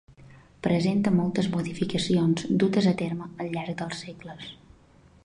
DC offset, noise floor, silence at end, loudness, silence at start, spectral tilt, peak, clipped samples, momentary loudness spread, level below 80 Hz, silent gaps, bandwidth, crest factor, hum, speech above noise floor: under 0.1%; -56 dBFS; 0.7 s; -26 LUFS; 0.2 s; -6.5 dB/octave; -10 dBFS; under 0.1%; 17 LU; -58 dBFS; none; 11 kHz; 16 dB; none; 30 dB